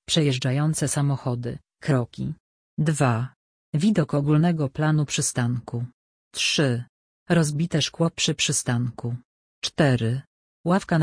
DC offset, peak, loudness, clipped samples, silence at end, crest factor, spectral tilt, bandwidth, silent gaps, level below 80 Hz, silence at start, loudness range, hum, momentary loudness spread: under 0.1%; -6 dBFS; -24 LUFS; under 0.1%; 0 s; 18 dB; -5 dB/octave; 10.5 kHz; 2.40-2.77 s, 3.36-3.73 s, 5.93-6.31 s, 6.89-7.26 s, 9.25-9.62 s, 10.27-10.64 s; -56 dBFS; 0.1 s; 2 LU; none; 12 LU